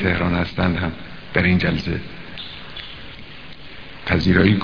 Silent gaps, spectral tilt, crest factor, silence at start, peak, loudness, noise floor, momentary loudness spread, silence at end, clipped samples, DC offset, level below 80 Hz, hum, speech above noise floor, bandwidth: none; -8 dB/octave; 20 dB; 0 s; 0 dBFS; -20 LUFS; -39 dBFS; 21 LU; 0 s; under 0.1%; 1%; -38 dBFS; none; 20 dB; 5.4 kHz